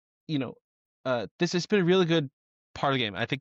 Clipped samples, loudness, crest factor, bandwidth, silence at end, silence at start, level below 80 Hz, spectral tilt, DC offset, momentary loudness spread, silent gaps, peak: under 0.1%; -27 LUFS; 14 dB; 7.8 kHz; 0 s; 0.3 s; -66 dBFS; -5.5 dB/octave; under 0.1%; 15 LU; 0.61-1.04 s, 1.31-1.39 s, 2.33-2.74 s; -14 dBFS